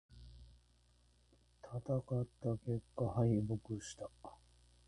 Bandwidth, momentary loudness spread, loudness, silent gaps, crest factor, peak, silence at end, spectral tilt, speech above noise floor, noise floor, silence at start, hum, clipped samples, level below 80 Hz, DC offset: 11 kHz; 24 LU; -40 LUFS; none; 20 dB; -22 dBFS; 0.55 s; -8 dB/octave; 32 dB; -71 dBFS; 0.1 s; none; under 0.1%; -62 dBFS; under 0.1%